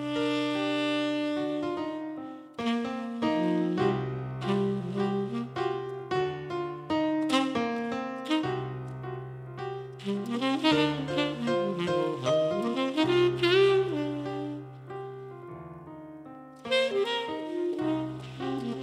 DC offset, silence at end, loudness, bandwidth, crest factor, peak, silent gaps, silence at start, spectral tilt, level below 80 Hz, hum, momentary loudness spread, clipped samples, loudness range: under 0.1%; 0 s; -29 LUFS; 13 kHz; 20 dB; -10 dBFS; none; 0 s; -6 dB/octave; -64 dBFS; none; 16 LU; under 0.1%; 6 LU